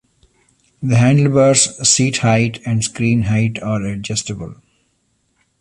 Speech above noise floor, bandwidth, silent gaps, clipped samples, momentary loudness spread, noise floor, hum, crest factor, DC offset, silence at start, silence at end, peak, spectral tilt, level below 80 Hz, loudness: 49 dB; 11.5 kHz; none; under 0.1%; 10 LU; -64 dBFS; none; 16 dB; under 0.1%; 0.8 s; 1.1 s; 0 dBFS; -4.5 dB/octave; -46 dBFS; -15 LUFS